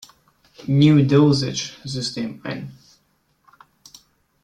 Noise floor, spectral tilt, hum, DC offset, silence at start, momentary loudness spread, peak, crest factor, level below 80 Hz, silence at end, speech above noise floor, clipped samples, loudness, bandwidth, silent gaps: -65 dBFS; -6.5 dB/octave; none; under 0.1%; 0.65 s; 18 LU; -2 dBFS; 18 dB; -56 dBFS; 1.7 s; 47 dB; under 0.1%; -19 LUFS; 10 kHz; none